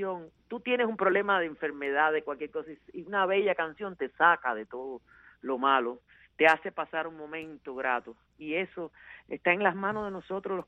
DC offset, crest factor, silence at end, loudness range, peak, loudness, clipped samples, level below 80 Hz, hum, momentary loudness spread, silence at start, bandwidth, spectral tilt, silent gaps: under 0.1%; 22 dB; 0.05 s; 4 LU; -8 dBFS; -29 LUFS; under 0.1%; -70 dBFS; none; 18 LU; 0 s; 9 kHz; -6 dB/octave; none